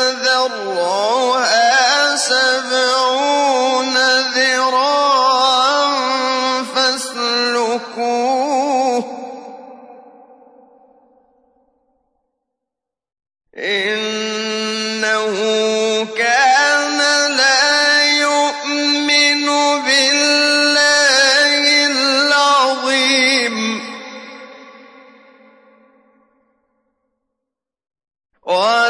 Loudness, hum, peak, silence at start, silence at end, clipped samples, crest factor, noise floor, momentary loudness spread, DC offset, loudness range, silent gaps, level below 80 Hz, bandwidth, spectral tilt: -14 LUFS; none; -2 dBFS; 0 s; 0 s; under 0.1%; 14 dB; -83 dBFS; 9 LU; under 0.1%; 12 LU; none; -78 dBFS; 11 kHz; -0.5 dB/octave